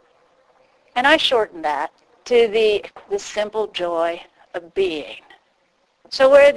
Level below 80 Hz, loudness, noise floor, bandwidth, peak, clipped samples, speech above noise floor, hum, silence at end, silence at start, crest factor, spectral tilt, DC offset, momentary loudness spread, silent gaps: -56 dBFS; -19 LUFS; -64 dBFS; 11 kHz; 0 dBFS; under 0.1%; 46 dB; none; 0 s; 0.95 s; 18 dB; -2.5 dB/octave; under 0.1%; 19 LU; none